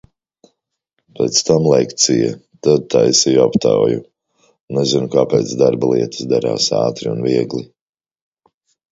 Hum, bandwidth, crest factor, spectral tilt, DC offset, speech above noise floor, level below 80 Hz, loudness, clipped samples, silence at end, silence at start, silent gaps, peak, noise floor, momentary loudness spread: none; 8 kHz; 16 dB; -4.5 dB/octave; under 0.1%; 57 dB; -54 dBFS; -15 LUFS; under 0.1%; 1.25 s; 1.2 s; 4.60-4.68 s; 0 dBFS; -72 dBFS; 8 LU